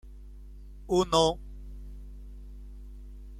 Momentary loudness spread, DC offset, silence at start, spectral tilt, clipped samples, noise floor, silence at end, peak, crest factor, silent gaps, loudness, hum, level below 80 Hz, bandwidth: 25 LU; under 0.1%; 0.05 s; -5 dB/octave; under 0.1%; -46 dBFS; 0 s; -10 dBFS; 22 dB; none; -27 LUFS; 50 Hz at -45 dBFS; -44 dBFS; 14 kHz